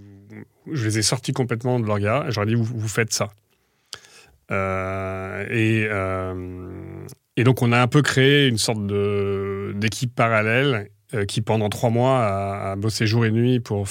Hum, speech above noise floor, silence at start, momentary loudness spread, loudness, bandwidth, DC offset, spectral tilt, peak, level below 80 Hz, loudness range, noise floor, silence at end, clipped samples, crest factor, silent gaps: none; 43 dB; 0 s; 14 LU; -21 LUFS; 16.5 kHz; under 0.1%; -5 dB/octave; -2 dBFS; -58 dBFS; 6 LU; -64 dBFS; 0 s; under 0.1%; 20 dB; none